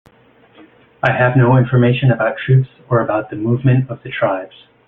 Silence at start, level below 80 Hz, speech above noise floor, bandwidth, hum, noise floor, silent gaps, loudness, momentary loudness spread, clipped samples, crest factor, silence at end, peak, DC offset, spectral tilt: 1.05 s; -50 dBFS; 35 dB; 3.9 kHz; none; -50 dBFS; none; -15 LUFS; 8 LU; under 0.1%; 16 dB; 0.4 s; 0 dBFS; under 0.1%; -10 dB/octave